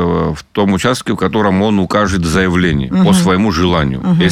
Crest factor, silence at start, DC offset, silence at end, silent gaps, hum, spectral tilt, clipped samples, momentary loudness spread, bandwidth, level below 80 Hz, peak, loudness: 10 dB; 0 s; under 0.1%; 0 s; none; none; -6 dB/octave; under 0.1%; 5 LU; 14 kHz; -30 dBFS; -2 dBFS; -13 LUFS